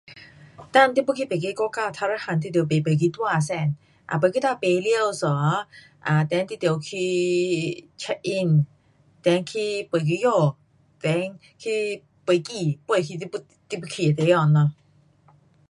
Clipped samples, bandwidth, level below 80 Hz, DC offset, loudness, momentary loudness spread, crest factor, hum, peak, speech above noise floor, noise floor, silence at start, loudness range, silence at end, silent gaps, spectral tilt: under 0.1%; 11.5 kHz; -66 dBFS; under 0.1%; -23 LUFS; 12 LU; 20 dB; none; -4 dBFS; 36 dB; -59 dBFS; 0.1 s; 2 LU; 0.95 s; none; -6 dB/octave